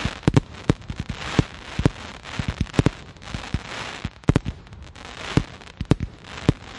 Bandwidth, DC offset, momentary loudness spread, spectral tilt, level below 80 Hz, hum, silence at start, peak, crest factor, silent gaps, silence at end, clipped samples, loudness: 11.5 kHz; under 0.1%; 14 LU; -6.5 dB/octave; -36 dBFS; none; 0 s; -2 dBFS; 24 dB; none; 0 s; under 0.1%; -26 LUFS